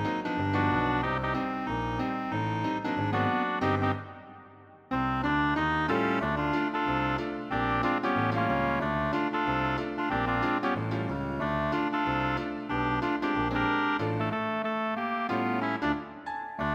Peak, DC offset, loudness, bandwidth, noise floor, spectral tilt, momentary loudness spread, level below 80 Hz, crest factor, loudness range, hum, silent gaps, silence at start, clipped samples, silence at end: -14 dBFS; under 0.1%; -29 LUFS; 8 kHz; -52 dBFS; -7.5 dB/octave; 5 LU; -48 dBFS; 16 dB; 2 LU; none; none; 0 s; under 0.1%; 0 s